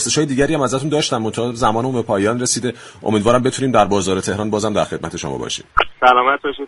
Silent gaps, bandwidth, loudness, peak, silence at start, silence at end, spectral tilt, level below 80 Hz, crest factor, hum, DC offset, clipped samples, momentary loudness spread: none; 11.5 kHz; -17 LUFS; 0 dBFS; 0 s; 0 s; -4 dB/octave; -42 dBFS; 18 dB; none; under 0.1%; under 0.1%; 9 LU